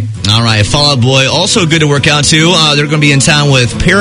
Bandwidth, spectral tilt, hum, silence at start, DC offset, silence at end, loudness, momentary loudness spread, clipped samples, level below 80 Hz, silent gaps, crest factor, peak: 11 kHz; -4 dB/octave; none; 0 s; under 0.1%; 0 s; -7 LUFS; 3 LU; 0.7%; -28 dBFS; none; 8 dB; 0 dBFS